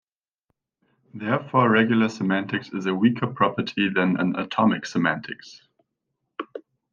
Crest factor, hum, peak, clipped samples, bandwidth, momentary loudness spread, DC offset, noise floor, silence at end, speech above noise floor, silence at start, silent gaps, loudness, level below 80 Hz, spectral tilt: 20 dB; none; -4 dBFS; under 0.1%; 7.4 kHz; 18 LU; under 0.1%; -79 dBFS; 0.3 s; 57 dB; 1.15 s; none; -23 LUFS; -66 dBFS; -6.5 dB/octave